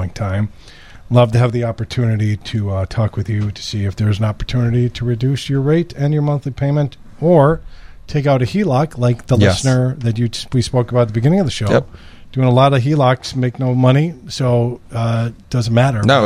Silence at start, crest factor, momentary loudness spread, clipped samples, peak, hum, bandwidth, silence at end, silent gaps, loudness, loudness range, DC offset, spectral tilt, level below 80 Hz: 0 s; 16 dB; 8 LU; under 0.1%; 0 dBFS; none; 11 kHz; 0 s; none; -16 LUFS; 3 LU; under 0.1%; -7 dB/octave; -38 dBFS